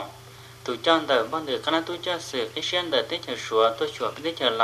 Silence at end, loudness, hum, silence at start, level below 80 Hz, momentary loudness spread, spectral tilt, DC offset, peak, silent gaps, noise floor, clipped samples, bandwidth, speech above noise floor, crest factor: 0 s; -25 LUFS; none; 0 s; -64 dBFS; 11 LU; -3 dB/octave; under 0.1%; -6 dBFS; none; -45 dBFS; under 0.1%; 14 kHz; 20 dB; 20 dB